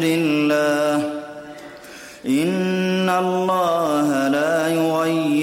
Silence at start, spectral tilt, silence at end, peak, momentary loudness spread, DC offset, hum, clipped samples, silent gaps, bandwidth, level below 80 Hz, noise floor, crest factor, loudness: 0 s; -5.5 dB/octave; 0 s; -8 dBFS; 18 LU; under 0.1%; none; under 0.1%; none; 16.5 kHz; -64 dBFS; -39 dBFS; 12 dB; -19 LUFS